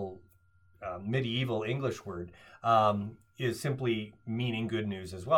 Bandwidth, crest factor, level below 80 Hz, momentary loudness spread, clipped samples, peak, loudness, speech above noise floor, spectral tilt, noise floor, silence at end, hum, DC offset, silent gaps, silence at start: 16.5 kHz; 20 dB; -66 dBFS; 16 LU; under 0.1%; -12 dBFS; -32 LUFS; 33 dB; -6.5 dB/octave; -65 dBFS; 0 s; none; under 0.1%; none; 0 s